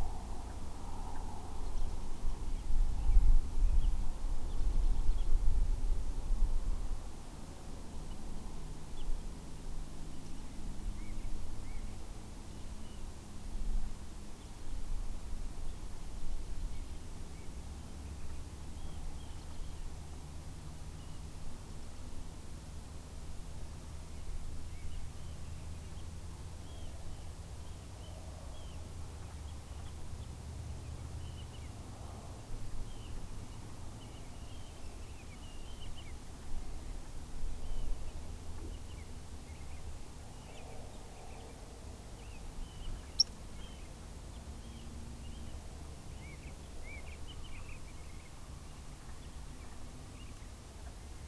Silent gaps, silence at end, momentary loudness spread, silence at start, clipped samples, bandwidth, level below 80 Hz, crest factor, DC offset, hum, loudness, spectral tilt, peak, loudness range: none; 0 s; 12 LU; 0 s; under 0.1%; 11 kHz; -38 dBFS; 22 dB; under 0.1%; none; -45 LUFS; -4.5 dB/octave; -14 dBFS; 11 LU